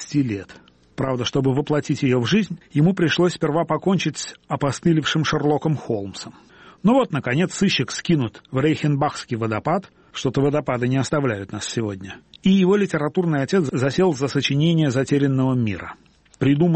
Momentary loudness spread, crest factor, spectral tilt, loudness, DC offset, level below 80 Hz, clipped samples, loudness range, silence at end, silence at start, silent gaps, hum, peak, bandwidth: 9 LU; 14 dB; -6 dB/octave; -21 LUFS; under 0.1%; -54 dBFS; under 0.1%; 3 LU; 0 s; 0 s; none; none; -6 dBFS; 8.8 kHz